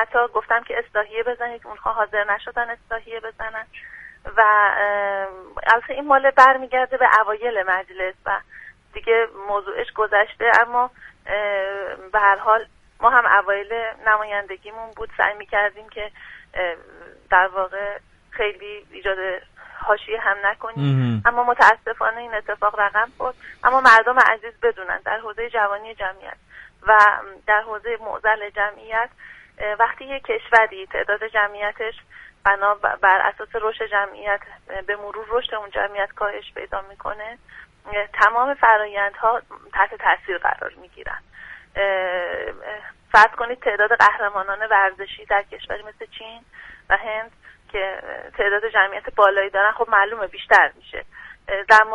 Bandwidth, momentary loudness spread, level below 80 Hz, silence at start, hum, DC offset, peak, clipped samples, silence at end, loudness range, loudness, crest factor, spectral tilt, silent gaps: 11.5 kHz; 18 LU; -50 dBFS; 0 s; none; under 0.1%; 0 dBFS; under 0.1%; 0 s; 7 LU; -19 LUFS; 20 dB; -5 dB/octave; none